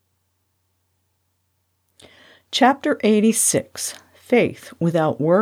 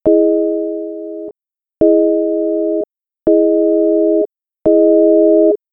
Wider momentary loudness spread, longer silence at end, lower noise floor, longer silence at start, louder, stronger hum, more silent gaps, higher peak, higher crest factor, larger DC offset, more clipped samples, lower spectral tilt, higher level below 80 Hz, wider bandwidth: second, 12 LU vs 15 LU; second, 0 s vs 0.15 s; second, -70 dBFS vs -89 dBFS; first, 2.5 s vs 0.05 s; second, -19 LUFS vs -13 LUFS; neither; neither; second, -4 dBFS vs 0 dBFS; first, 18 dB vs 12 dB; second, under 0.1% vs 0.3%; neither; second, -4 dB/octave vs -12 dB/octave; second, -68 dBFS vs -50 dBFS; first, 16.5 kHz vs 1.6 kHz